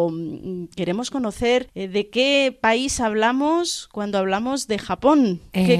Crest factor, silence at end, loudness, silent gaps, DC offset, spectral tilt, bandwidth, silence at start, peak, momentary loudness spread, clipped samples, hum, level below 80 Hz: 18 dB; 0 s; -21 LUFS; none; under 0.1%; -4.5 dB/octave; 14.5 kHz; 0 s; -4 dBFS; 9 LU; under 0.1%; none; -48 dBFS